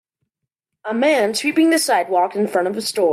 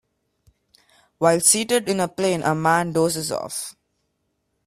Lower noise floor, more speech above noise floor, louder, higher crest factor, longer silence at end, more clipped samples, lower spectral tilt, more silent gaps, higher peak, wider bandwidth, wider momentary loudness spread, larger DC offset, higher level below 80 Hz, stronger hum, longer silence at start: first, -80 dBFS vs -73 dBFS; first, 63 dB vs 53 dB; about the same, -18 LUFS vs -20 LUFS; second, 14 dB vs 20 dB; second, 0 s vs 0.95 s; neither; about the same, -3 dB/octave vs -3.5 dB/octave; neither; second, -6 dBFS vs -2 dBFS; about the same, 15.5 kHz vs 16 kHz; second, 6 LU vs 12 LU; neither; second, -70 dBFS vs -62 dBFS; neither; second, 0.85 s vs 1.2 s